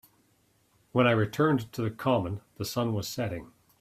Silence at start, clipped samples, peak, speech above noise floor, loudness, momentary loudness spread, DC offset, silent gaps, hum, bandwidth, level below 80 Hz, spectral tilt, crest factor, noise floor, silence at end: 0.95 s; under 0.1%; -8 dBFS; 40 dB; -29 LUFS; 11 LU; under 0.1%; none; none; 16 kHz; -62 dBFS; -6 dB/octave; 20 dB; -68 dBFS; 0.35 s